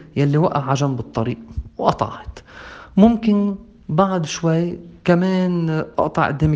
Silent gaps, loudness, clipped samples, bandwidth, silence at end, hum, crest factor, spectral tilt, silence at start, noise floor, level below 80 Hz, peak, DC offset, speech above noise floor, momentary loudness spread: none; -19 LUFS; under 0.1%; 7.8 kHz; 0 s; none; 18 dB; -7 dB/octave; 0 s; -39 dBFS; -42 dBFS; 0 dBFS; under 0.1%; 21 dB; 17 LU